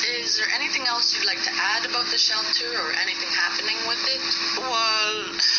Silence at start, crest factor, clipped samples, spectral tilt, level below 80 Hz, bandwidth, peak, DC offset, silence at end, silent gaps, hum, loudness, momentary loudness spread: 0 s; 16 dB; under 0.1%; 3 dB/octave; -66 dBFS; 7 kHz; -8 dBFS; under 0.1%; 0 s; none; none; -21 LUFS; 4 LU